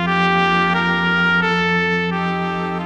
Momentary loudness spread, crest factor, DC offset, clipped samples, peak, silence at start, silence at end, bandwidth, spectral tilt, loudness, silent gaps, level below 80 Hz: 5 LU; 14 dB; 0.3%; under 0.1%; -4 dBFS; 0 s; 0 s; 8 kHz; -6 dB/octave; -17 LUFS; none; -50 dBFS